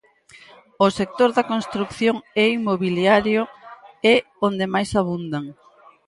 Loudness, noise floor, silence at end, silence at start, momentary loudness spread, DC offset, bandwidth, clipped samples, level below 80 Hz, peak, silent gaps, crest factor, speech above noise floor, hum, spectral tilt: -20 LUFS; -49 dBFS; 0.55 s; 0.8 s; 10 LU; under 0.1%; 11.5 kHz; under 0.1%; -54 dBFS; -2 dBFS; none; 18 dB; 30 dB; none; -5.5 dB/octave